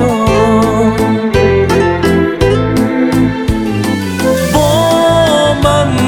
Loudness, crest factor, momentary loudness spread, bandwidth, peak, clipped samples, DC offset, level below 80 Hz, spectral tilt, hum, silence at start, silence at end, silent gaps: -11 LUFS; 10 dB; 5 LU; over 20 kHz; 0 dBFS; under 0.1%; under 0.1%; -26 dBFS; -6 dB/octave; none; 0 s; 0 s; none